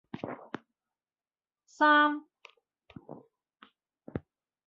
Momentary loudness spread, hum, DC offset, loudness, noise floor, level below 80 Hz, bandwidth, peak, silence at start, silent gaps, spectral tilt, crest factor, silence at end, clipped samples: 27 LU; none; under 0.1%; -26 LUFS; under -90 dBFS; -68 dBFS; 7.6 kHz; -14 dBFS; 0.15 s; none; -5.5 dB/octave; 20 dB; 0.45 s; under 0.1%